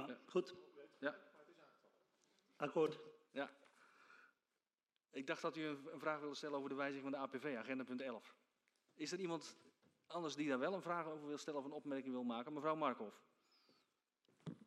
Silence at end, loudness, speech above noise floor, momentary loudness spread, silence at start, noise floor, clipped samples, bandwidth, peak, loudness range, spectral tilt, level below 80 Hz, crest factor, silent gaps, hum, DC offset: 0 s; -46 LUFS; over 45 dB; 15 LU; 0 s; under -90 dBFS; under 0.1%; 13 kHz; -26 dBFS; 4 LU; -5 dB/octave; under -90 dBFS; 22 dB; none; none; under 0.1%